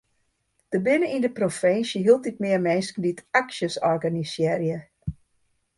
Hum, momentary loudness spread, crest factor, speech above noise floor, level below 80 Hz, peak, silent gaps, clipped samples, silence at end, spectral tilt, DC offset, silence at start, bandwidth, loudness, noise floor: none; 9 LU; 20 dB; 48 dB; -54 dBFS; -4 dBFS; none; under 0.1%; 0.65 s; -5.5 dB/octave; under 0.1%; 0.7 s; 11.5 kHz; -24 LUFS; -71 dBFS